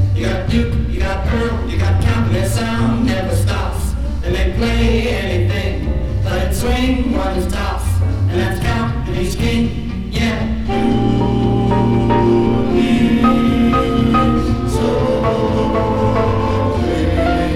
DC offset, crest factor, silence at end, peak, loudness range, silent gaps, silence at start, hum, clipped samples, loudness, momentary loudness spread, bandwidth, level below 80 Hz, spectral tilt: under 0.1%; 14 dB; 0 s; 0 dBFS; 4 LU; none; 0 s; none; under 0.1%; -16 LUFS; 6 LU; 15.5 kHz; -22 dBFS; -7 dB/octave